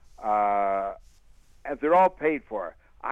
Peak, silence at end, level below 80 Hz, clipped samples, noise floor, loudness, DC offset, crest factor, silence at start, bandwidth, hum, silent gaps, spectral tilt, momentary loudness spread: -10 dBFS; 0 s; -56 dBFS; under 0.1%; -54 dBFS; -25 LUFS; under 0.1%; 16 dB; 0.2 s; 7.6 kHz; none; none; -7 dB/octave; 18 LU